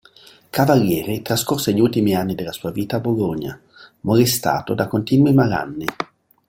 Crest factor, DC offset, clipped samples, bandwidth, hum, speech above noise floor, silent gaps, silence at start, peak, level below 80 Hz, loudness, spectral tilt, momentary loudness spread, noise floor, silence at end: 18 dB; under 0.1%; under 0.1%; 17 kHz; none; 30 dB; none; 0.55 s; -2 dBFS; -50 dBFS; -19 LUFS; -5.5 dB/octave; 11 LU; -48 dBFS; 0.45 s